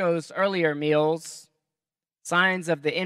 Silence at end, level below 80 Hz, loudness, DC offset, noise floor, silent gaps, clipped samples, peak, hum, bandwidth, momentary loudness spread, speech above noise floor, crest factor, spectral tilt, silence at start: 0 s; -82 dBFS; -24 LUFS; under 0.1%; under -90 dBFS; none; under 0.1%; -8 dBFS; none; 14 kHz; 17 LU; over 66 dB; 18 dB; -4.5 dB/octave; 0 s